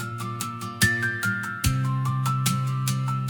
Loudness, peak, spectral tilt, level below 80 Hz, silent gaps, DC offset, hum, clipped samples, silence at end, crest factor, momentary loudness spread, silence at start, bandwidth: -25 LUFS; -4 dBFS; -4 dB/octave; -44 dBFS; none; under 0.1%; none; under 0.1%; 0 s; 20 dB; 9 LU; 0 s; 18 kHz